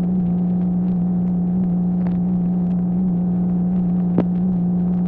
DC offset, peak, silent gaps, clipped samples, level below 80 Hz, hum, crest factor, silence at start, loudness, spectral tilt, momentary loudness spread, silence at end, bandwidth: under 0.1%; -4 dBFS; none; under 0.1%; -40 dBFS; 60 Hz at -35 dBFS; 14 dB; 0 s; -19 LUFS; -13.5 dB/octave; 1 LU; 0 s; 2.2 kHz